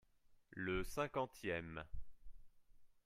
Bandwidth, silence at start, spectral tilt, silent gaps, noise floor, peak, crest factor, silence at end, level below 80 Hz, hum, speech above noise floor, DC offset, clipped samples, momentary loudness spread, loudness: 15.5 kHz; 0.3 s; -5.5 dB/octave; none; -70 dBFS; -26 dBFS; 20 dB; 0.2 s; -58 dBFS; none; 27 dB; under 0.1%; under 0.1%; 15 LU; -44 LUFS